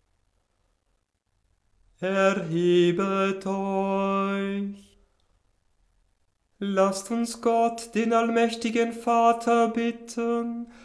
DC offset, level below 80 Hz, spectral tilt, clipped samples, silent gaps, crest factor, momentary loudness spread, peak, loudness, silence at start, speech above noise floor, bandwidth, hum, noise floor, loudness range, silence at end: under 0.1%; -66 dBFS; -5.5 dB/octave; under 0.1%; none; 18 dB; 9 LU; -8 dBFS; -25 LUFS; 2 s; 49 dB; 11 kHz; none; -73 dBFS; 6 LU; 0.15 s